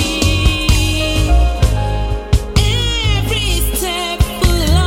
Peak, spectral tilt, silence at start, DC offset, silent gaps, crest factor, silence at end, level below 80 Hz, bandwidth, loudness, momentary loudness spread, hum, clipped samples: 0 dBFS; -4.5 dB/octave; 0 s; under 0.1%; none; 12 dB; 0 s; -16 dBFS; 17 kHz; -15 LUFS; 4 LU; none; under 0.1%